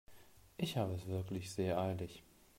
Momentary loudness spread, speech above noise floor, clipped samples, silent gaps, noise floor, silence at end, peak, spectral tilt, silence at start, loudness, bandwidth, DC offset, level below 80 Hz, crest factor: 13 LU; 23 dB; under 0.1%; none; -62 dBFS; 0.35 s; -22 dBFS; -6 dB/octave; 0.1 s; -40 LUFS; 16 kHz; under 0.1%; -68 dBFS; 18 dB